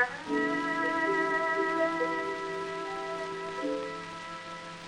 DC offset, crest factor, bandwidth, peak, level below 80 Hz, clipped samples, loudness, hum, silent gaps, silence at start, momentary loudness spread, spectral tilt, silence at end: under 0.1%; 20 dB; 11 kHz; -12 dBFS; -70 dBFS; under 0.1%; -31 LUFS; none; none; 0 s; 12 LU; -4.5 dB/octave; 0 s